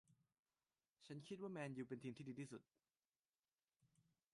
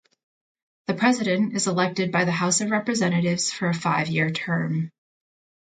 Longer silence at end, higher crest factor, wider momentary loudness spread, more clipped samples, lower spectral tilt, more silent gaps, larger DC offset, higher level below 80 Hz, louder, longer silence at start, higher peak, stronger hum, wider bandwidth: second, 0.5 s vs 0.85 s; about the same, 18 dB vs 18 dB; about the same, 8 LU vs 6 LU; neither; first, -6.5 dB/octave vs -4.5 dB/octave; first, 0.39-0.44 s, 3.09-3.23 s, 3.29-3.33 s, 3.39-3.43 s vs none; neither; second, under -90 dBFS vs -66 dBFS; second, -54 LUFS vs -23 LUFS; second, 0.1 s vs 0.9 s; second, -38 dBFS vs -6 dBFS; neither; first, 11 kHz vs 9.4 kHz